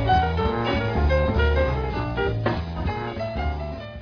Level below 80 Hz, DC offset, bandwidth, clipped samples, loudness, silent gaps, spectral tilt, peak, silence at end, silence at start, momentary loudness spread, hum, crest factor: -28 dBFS; under 0.1%; 5.4 kHz; under 0.1%; -24 LUFS; none; -8 dB/octave; -8 dBFS; 0 s; 0 s; 8 LU; none; 16 dB